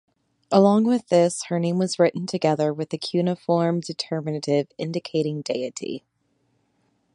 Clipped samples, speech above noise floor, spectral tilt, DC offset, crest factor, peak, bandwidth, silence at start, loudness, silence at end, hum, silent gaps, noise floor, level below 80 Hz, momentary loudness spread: under 0.1%; 47 dB; -6 dB/octave; under 0.1%; 20 dB; -2 dBFS; 11 kHz; 0.5 s; -23 LUFS; 1.15 s; none; none; -69 dBFS; -72 dBFS; 10 LU